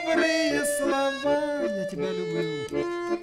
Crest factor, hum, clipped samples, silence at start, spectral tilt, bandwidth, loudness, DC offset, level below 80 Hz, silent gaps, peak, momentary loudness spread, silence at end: 16 dB; none; under 0.1%; 0 s; -4 dB/octave; 16 kHz; -26 LUFS; under 0.1%; -58 dBFS; none; -10 dBFS; 7 LU; 0 s